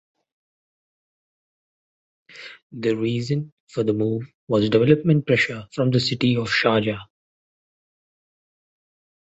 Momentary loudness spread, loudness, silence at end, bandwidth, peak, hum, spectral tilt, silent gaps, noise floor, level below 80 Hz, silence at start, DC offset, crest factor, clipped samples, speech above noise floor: 15 LU; -21 LUFS; 2.15 s; 8.2 kHz; -2 dBFS; none; -6.5 dB/octave; 2.63-2.70 s, 3.52-3.67 s, 4.34-4.47 s; under -90 dBFS; -58 dBFS; 2.35 s; under 0.1%; 22 dB; under 0.1%; over 69 dB